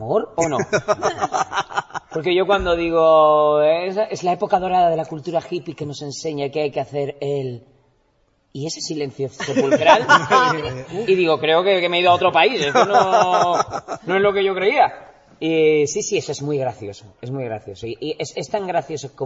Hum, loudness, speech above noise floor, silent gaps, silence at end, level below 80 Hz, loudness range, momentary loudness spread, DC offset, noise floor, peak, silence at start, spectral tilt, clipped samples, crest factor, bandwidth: none; -19 LUFS; 44 dB; none; 0 s; -50 dBFS; 10 LU; 14 LU; under 0.1%; -62 dBFS; 0 dBFS; 0 s; -4.5 dB/octave; under 0.1%; 18 dB; 8 kHz